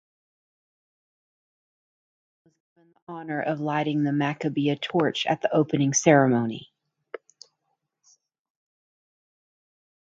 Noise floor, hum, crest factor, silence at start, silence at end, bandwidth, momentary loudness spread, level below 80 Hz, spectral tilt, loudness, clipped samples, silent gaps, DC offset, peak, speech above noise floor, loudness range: -78 dBFS; none; 24 dB; 3.1 s; 3.45 s; 9 kHz; 23 LU; -72 dBFS; -5 dB/octave; -24 LUFS; under 0.1%; none; under 0.1%; -4 dBFS; 54 dB; 12 LU